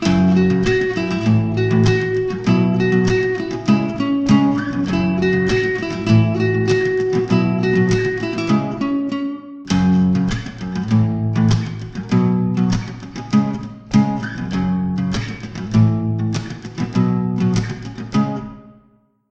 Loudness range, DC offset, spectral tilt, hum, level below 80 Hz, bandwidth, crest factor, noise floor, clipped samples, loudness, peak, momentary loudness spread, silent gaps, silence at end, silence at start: 3 LU; under 0.1%; -7.5 dB/octave; none; -40 dBFS; 8.2 kHz; 16 dB; -56 dBFS; under 0.1%; -18 LUFS; -2 dBFS; 10 LU; none; 0.6 s; 0 s